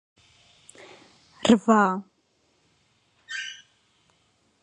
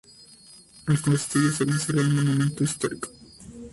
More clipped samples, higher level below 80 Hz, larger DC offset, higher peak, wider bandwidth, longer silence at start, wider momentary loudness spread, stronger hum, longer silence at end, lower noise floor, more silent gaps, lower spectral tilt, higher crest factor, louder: neither; second, -66 dBFS vs -56 dBFS; neither; first, -4 dBFS vs -10 dBFS; second, 10 kHz vs 11.5 kHz; first, 1.45 s vs 0.85 s; first, 23 LU vs 15 LU; neither; first, 1.1 s vs 0.05 s; first, -68 dBFS vs -51 dBFS; neither; about the same, -5 dB/octave vs -5.5 dB/octave; first, 24 dB vs 16 dB; about the same, -23 LUFS vs -24 LUFS